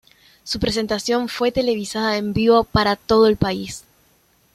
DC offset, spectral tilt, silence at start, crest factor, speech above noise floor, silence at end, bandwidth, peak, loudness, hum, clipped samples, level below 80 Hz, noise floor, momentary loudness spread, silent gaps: under 0.1%; -5 dB/octave; 0.45 s; 18 dB; 40 dB; 0.75 s; 14 kHz; -2 dBFS; -19 LUFS; none; under 0.1%; -42 dBFS; -59 dBFS; 12 LU; none